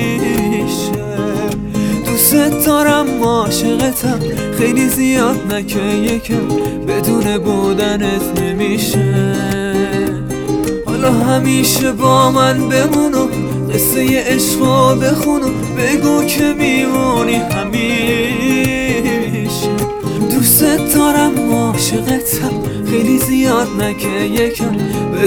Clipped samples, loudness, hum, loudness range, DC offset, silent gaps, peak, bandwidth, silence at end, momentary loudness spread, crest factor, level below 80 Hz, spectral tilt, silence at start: under 0.1%; -14 LUFS; none; 3 LU; under 0.1%; none; 0 dBFS; over 20 kHz; 0 s; 7 LU; 14 dB; -36 dBFS; -4.5 dB/octave; 0 s